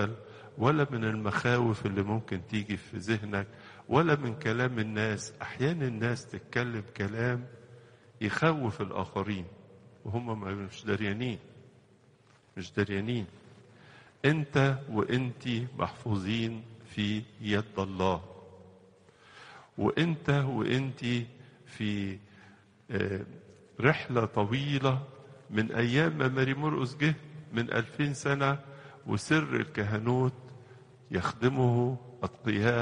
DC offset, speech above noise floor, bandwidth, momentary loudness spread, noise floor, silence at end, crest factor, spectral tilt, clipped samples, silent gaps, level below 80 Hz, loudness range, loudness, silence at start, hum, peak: under 0.1%; 32 dB; 10.5 kHz; 13 LU; -62 dBFS; 0 s; 24 dB; -6.5 dB/octave; under 0.1%; none; -62 dBFS; 6 LU; -31 LUFS; 0 s; none; -8 dBFS